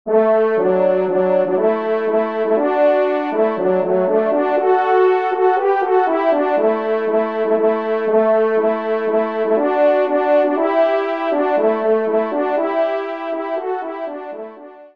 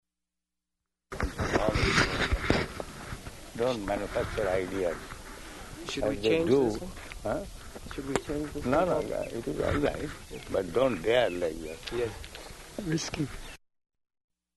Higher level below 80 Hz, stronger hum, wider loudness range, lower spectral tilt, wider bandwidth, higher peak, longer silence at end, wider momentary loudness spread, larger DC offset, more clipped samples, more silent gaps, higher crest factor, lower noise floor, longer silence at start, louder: second, -70 dBFS vs -44 dBFS; neither; about the same, 2 LU vs 3 LU; first, -8 dB/octave vs -5 dB/octave; second, 5.2 kHz vs 12 kHz; about the same, -4 dBFS vs -6 dBFS; second, 0.1 s vs 1 s; second, 8 LU vs 17 LU; first, 0.3% vs under 0.1%; neither; neither; second, 14 dB vs 24 dB; second, -37 dBFS vs -86 dBFS; second, 0.05 s vs 1.1 s; first, -17 LUFS vs -30 LUFS